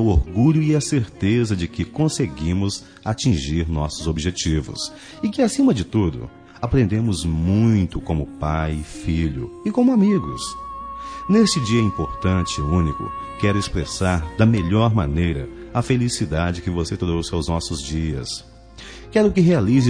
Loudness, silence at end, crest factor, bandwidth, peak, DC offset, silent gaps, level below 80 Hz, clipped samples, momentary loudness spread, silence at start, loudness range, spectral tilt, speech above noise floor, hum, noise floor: -21 LUFS; 0 s; 16 dB; 10 kHz; -4 dBFS; under 0.1%; none; -34 dBFS; under 0.1%; 12 LU; 0 s; 3 LU; -6 dB/octave; 20 dB; none; -40 dBFS